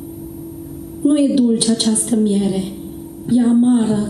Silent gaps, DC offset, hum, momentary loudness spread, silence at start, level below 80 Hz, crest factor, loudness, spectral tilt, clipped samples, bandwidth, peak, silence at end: none; under 0.1%; none; 18 LU; 0 s; -48 dBFS; 16 dB; -16 LUFS; -5 dB/octave; under 0.1%; 13 kHz; 0 dBFS; 0 s